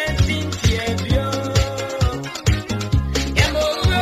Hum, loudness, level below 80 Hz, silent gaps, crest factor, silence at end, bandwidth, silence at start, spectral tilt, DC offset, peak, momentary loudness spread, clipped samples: none; -20 LUFS; -24 dBFS; none; 16 dB; 0 s; 15 kHz; 0 s; -5 dB/octave; under 0.1%; -2 dBFS; 4 LU; under 0.1%